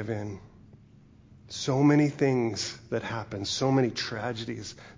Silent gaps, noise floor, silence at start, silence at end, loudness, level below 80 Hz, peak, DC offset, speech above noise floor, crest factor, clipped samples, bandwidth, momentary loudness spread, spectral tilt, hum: none; -55 dBFS; 0 s; 0 s; -28 LUFS; -58 dBFS; -10 dBFS; under 0.1%; 27 dB; 18 dB; under 0.1%; 7.6 kHz; 15 LU; -5.5 dB/octave; none